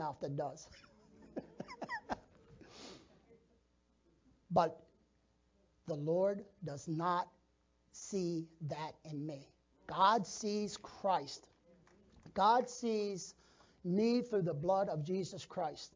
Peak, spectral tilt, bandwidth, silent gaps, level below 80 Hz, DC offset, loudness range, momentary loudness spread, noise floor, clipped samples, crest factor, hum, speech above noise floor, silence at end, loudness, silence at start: -18 dBFS; -5.5 dB/octave; 7.6 kHz; none; -72 dBFS; under 0.1%; 11 LU; 20 LU; -75 dBFS; under 0.1%; 22 dB; none; 38 dB; 0.05 s; -37 LUFS; 0 s